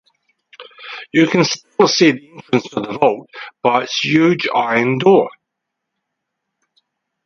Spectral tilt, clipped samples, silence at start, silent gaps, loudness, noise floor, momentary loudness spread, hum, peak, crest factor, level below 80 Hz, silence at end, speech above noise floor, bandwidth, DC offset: -4.5 dB/octave; under 0.1%; 0.6 s; none; -15 LUFS; -78 dBFS; 15 LU; none; 0 dBFS; 18 dB; -64 dBFS; 1.95 s; 63 dB; 7.4 kHz; under 0.1%